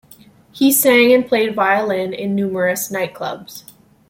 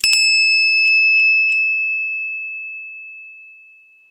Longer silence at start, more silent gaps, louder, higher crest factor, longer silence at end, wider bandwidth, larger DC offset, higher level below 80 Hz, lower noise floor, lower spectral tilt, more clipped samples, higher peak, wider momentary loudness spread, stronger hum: first, 0.55 s vs 0.05 s; neither; second, -16 LUFS vs -13 LUFS; about the same, 16 dB vs 14 dB; second, 0.5 s vs 0.65 s; about the same, 16.5 kHz vs 16 kHz; neither; about the same, -60 dBFS vs -64 dBFS; about the same, -46 dBFS vs -48 dBFS; first, -3.5 dB/octave vs 5 dB/octave; neither; about the same, -2 dBFS vs -4 dBFS; second, 16 LU vs 19 LU; neither